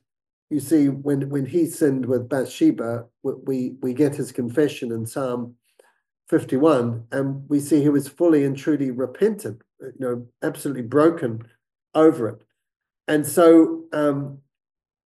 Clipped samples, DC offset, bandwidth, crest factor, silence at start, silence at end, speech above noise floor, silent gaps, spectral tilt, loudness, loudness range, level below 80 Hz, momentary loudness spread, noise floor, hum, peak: under 0.1%; under 0.1%; 12.5 kHz; 18 dB; 0.5 s; 0.75 s; 39 dB; none; -6.5 dB/octave; -21 LUFS; 4 LU; -70 dBFS; 11 LU; -60 dBFS; none; -2 dBFS